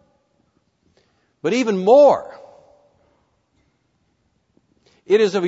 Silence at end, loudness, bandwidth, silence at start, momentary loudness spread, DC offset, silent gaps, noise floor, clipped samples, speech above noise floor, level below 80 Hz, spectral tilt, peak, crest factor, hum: 0 s; -16 LUFS; 8 kHz; 1.45 s; 14 LU; under 0.1%; none; -66 dBFS; under 0.1%; 51 dB; -68 dBFS; -5.5 dB/octave; -2 dBFS; 18 dB; none